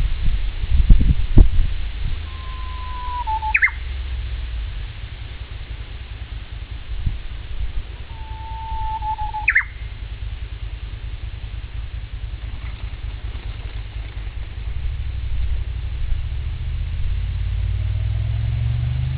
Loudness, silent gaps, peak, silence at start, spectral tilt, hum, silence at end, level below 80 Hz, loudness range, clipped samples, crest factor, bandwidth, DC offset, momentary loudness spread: -25 LUFS; none; 0 dBFS; 0 s; -9.5 dB/octave; none; 0 s; -24 dBFS; 10 LU; under 0.1%; 20 dB; 4 kHz; under 0.1%; 16 LU